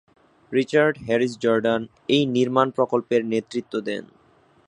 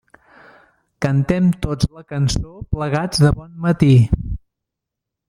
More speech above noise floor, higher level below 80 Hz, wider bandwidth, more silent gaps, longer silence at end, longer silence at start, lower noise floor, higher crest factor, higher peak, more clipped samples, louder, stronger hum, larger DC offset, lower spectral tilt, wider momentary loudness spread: second, 36 dB vs 66 dB; second, -64 dBFS vs -32 dBFS; second, 10.5 kHz vs 14 kHz; neither; second, 0.6 s vs 0.9 s; second, 0.5 s vs 1 s; second, -58 dBFS vs -82 dBFS; about the same, 20 dB vs 16 dB; about the same, -2 dBFS vs -2 dBFS; neither; second, -22 LUFS vs -18 LUFS; neither; neither; about the same, -6 dB/octave vs -6.5 dB/octave; second, 8 LU vs 12 LU